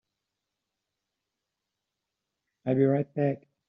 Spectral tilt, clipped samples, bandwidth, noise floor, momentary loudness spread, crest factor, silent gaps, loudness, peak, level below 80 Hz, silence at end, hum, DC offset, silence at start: -9.5 dB/octave; under 0.1%; 3.8 kHz; -86 dBFS; 6 LU; 20 dB; none; -27 LUFS; -12 dBFS; -76 dBFS; 0.3 s; none; under 0.1%; 2.65 s